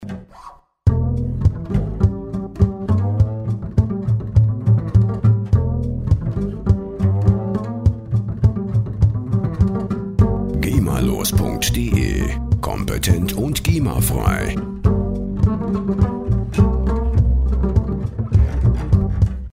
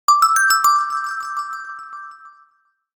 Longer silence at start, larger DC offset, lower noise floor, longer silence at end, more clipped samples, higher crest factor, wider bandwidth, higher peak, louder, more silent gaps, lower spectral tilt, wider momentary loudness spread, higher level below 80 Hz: about the same, 0 s vs 0.1 s; neither; second, -42 dBFS vs -62 dBFS; second, 0.1 s vs 0.65 s; neither; about the same, 16 dB vs 16 dB; second, 16 kHz vs over 20 kHz; about the same, -2 dBFS vs -4 dBFS; second, -19 LUFS vs -16 LUFS; neither; first, -6.5 dB/octave vs 4 dB/octave; second, 6 LU vs 21 LU; first, -24 dBFS vs -68 dBFS